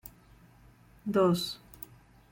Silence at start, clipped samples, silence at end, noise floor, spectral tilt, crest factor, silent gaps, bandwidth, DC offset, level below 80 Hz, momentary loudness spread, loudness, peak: 0.05 s; under 0.1%; 0.75 s; -58 dBFS; -6 dB/octave; 20 dB; none; 17 kHz; under 0.1%; -62 dBFS; 21 LU; -29 LUFS; -14 dBFS